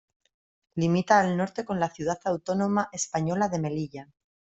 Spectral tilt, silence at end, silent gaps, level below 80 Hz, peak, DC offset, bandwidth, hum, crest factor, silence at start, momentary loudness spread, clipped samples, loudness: -5.5 dB/octave; 0.55 s; none; -64 dBFS; -6 dBFS; under 0.1%; 8.2 kHz; none; 22 dB; 0.75 s; 11 LU; under 0.1%; -27 LUFS